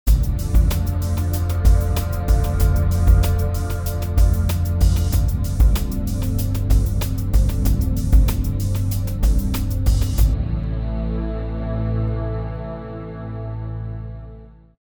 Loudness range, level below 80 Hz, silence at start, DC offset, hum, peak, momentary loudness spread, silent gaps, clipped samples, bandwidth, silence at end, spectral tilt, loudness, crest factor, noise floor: 7 LU; -20 dBFS; 0.05 s; under 0.1%; none; -4 dBFS; 11 LU; none; under 0.1%; over 20 kHz; 0.3 s; -6.5 dB/octave; -21 LUFS; 14 dB; -41 dBFS